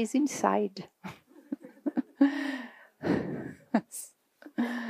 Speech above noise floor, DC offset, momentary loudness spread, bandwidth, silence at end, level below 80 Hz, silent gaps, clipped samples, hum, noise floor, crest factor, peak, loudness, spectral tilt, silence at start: 26 dB; under 0.1%; 18 LU; 15.5 kHz; 0 s; -70 dBFS; none; under 0.1%; none; -55 dBFS; 22 dB; -10 dBFS; -31 LUFS; -5 dB/octave; 0 s